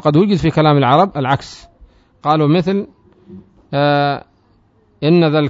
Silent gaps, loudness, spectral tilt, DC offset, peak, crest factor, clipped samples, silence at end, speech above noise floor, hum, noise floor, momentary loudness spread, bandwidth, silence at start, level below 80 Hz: none; -15 LUFS; -8 dB/octave; under 0.1%; 0 dBFS; 16 dB; under 0.1%; 0 s; 41 dB; none; -54 dBFS; 11 LU; 7.8 kHz; 0.05 s; -46 dBFS